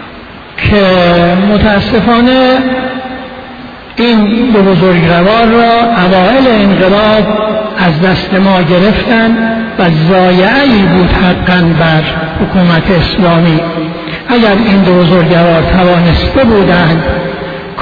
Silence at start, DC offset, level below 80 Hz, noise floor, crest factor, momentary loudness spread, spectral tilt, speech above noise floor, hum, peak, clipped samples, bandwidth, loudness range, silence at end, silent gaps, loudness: 0 s; under 0.1%; -24 dBFS; -28 dBFS; 8 dB; 10 LU; -8.5 dB/octave; 21 dB; none; 0 dBFS; 0.2%; 5.4 kHz; 2 LU; 0 s; none; -7 LUFS